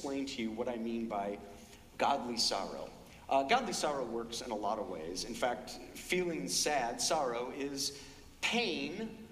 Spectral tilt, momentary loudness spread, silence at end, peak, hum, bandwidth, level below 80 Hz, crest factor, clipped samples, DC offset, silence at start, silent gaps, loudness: -2.5 dB/octave; 15 LU; 0 s; -16 dBFS; none; 15.5 kHz; -62 dBFS; 20 dB; under 0.1%; under 0.1%; 0 s; none; -35 LUFS